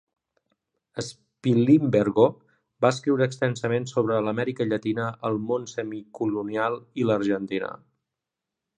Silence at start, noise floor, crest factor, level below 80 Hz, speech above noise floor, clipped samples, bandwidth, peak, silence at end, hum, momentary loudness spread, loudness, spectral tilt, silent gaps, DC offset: 0.95 s; -86 dBFS; 22 dB; -66 dBFS; 62 dB; under 0.1%; 10 kHz; -4 dBFS; 1 s; none; 14 LU; -25 LUFS; -7 dB/octave; none; under 0.1%